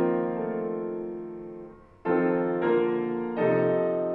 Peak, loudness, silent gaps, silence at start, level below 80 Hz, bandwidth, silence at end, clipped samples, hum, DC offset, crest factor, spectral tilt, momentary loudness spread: -14 dBFS; -27 LUFS; none; 0 s; -62 dBFS; 4.2 kHz; 0 s; under 0.1%; none; under 0.1%; 14 dB; -10.5 dB/octave; 15 LU